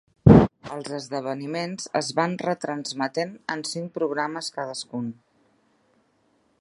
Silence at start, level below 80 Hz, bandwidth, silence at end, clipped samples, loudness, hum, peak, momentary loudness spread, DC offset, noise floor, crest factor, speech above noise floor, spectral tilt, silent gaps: 0.25 s; -42 dBFS; 11.5 kHz; 1.5 s; under 0.1%; -24 LUFS; none; 0 dBFS; 17 LU; under 0.1%; -66 dBFS; 24 dB; 37 dB; -6 dB/octave; none